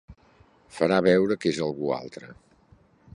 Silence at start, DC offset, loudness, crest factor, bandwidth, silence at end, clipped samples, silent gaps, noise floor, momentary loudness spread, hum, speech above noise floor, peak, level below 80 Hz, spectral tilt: 0.1 s; under 0.1%; -24 LUFS; 20 dB; 11 kHz; 0.8 s; under 0.1%; none; -58 dBFS; 22 LU; none; 34 dB; -6 dBFS; -60 dBFS; -6 dB/octave